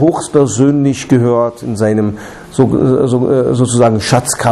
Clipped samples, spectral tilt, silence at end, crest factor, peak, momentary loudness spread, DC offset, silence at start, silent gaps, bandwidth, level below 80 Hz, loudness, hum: under 0.1%; -6 dB/octave; 0 s; 12 dB; 0 dBFS; 6 LU; under 0.1%; 0 s; none; 13.5 kHz; -42 dBFS; -12 LUFS; none